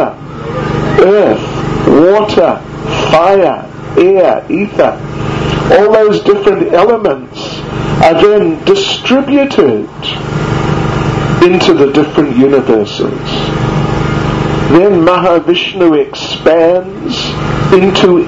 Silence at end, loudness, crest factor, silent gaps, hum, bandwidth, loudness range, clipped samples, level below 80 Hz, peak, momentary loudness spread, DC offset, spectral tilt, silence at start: 0 s; -9 LUFS; 8 dB; none; none; 8 kHz; 1 LU; 1%; -30 dBFS; 0 dBFS; 9 LU; under 0.1%; -6.5 dB/octave; 0 s